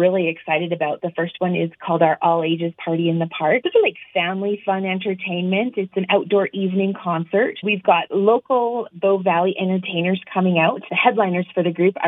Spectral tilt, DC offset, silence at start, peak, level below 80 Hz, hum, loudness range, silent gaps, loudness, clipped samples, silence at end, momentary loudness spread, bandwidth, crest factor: -9.5 dB/octave; under 0.1%; 0 s; -2 dBFS; -78 dBFS; none; 2 LU; none; -20 LUFS; under 0.1%; 0 s; 6 LU; 3.9 kHz; 18 dB